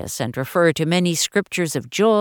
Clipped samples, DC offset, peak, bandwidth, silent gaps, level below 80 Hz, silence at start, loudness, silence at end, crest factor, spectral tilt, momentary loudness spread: under 0.1%; under 0.1%; -4 dBFS; 19 kHz; none; -56 dBFS; 0 s; -20 LUFS; 0 s; 16 dB; -4.5 dB/octave; 6 LU